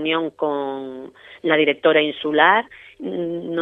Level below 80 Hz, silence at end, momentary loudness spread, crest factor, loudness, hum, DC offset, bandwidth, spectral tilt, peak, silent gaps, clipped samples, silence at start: -66 dBFS; 0 s; 19 LU; 20 dB; -19 LUFS; none; under 0.1%; 4 kHz; -7 dB/octave; 0 dBFS; none; under 0.1%; 0 s